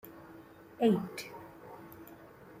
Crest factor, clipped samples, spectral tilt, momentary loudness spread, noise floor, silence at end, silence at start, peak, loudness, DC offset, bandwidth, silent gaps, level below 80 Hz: 22 dB; under 0.1%; -6.5 dB/octave; 24 LU; -54 dBFS; 0 s; 0.05 s; -16 dBFS; -32 LUFS; under 0.1%; 16 kHz; none; -72 dBFS